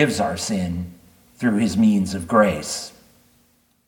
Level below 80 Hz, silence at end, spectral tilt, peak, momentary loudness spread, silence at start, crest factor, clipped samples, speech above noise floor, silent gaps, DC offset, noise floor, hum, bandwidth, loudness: -50 dBFS; 1 s; -5 dB/octave; -2 dBFS; 12 LU; 0 s; 20 dB; under 0.1%; 41 dB; none; under 0.1%; -61 dBFS; none; 18 kHz; -21 LUFS